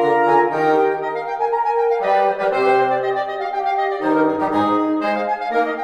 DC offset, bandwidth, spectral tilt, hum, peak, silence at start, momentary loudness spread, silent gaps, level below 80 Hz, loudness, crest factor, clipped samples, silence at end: under 0.1%; 9.6 kHz; -6.5 dB/octave; none; -4 dBFS; 0 s; 6 LU; none; -64 dBFS; -18 LUFS; 14 dB; under 0.1%; 0 s